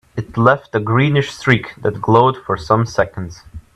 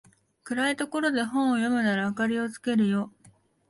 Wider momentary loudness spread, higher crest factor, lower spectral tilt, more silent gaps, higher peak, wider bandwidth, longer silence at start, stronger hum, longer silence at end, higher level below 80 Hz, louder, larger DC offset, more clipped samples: first, 10 LU vs 5 LU; about the same, 16 dB vs 14 dB; first, -7 dB/octave vs -5 dB/octave; neither; first, 0 dBFS vs -14 dBFS; about the same, 11 kHz vs 11.5 kHz; second, 0.15 s vs 0.45 s; neither; second, 0.15 s vs 0.6 s; first, -44 dBFS vs -70 dBFS; first, -16 LUFS vs -26 LUFS; neither; neither